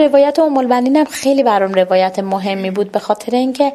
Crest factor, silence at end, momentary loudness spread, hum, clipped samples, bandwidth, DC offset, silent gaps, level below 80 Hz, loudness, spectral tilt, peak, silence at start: 12 dB; 0 s; 6 LU; none; under 0.1%; 13.5 kHz; under 0.1%; none; -62 dBFS; -14 LUFS; -5.5 dB/octave; 0 dBFS; 0 s